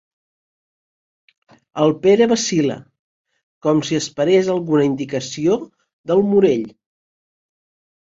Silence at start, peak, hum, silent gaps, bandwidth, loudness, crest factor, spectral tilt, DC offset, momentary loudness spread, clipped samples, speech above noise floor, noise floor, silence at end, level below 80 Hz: 1.75 s; -2 dBFS; none; 2.99-3.25 s, 3.43-3.61 s, 5.93-6.04 s; 7.8 kHz; -18 LUFS; 18 dB; -5.5 dB/octave; under 0.1%; 10 LU; under 0.1%; over 73 dB; under -90 dBFS; 1.3 s; -60 dBFS